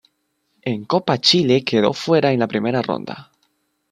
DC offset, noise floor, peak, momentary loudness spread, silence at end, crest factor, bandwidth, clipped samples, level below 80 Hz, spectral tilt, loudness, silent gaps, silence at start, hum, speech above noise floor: under 0.1%; -69 dBFS; -2 dBFS; 13 LU; 0.7 s; 18 dB; 11 kHz; under 0.1%; -62 dBFS; -5 dB/octave; -18 LUFS; none; 0.65 s; none; 51 dB